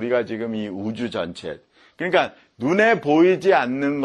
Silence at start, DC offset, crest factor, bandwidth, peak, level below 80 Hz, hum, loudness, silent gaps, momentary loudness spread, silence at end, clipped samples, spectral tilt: 0 s; under 0.1%; 18 dB; 10 kHz; -4 dBFS; -62 dBFS; none; -21 LUFS; none; 13 LU; 0 s; under 0.1%; -6 dB/octave